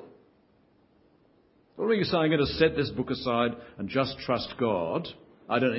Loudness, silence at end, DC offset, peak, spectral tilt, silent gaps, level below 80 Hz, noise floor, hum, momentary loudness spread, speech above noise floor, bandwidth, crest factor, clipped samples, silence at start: -28 LUFS; 0 s; under 0.1%; -8 dBFS; -10 dB/octave; none; -54 dBFS; -64 dBFS; none; 9 LU; 37 dB; 5.8 kHz; 20 dB; under 0.1%; 0 s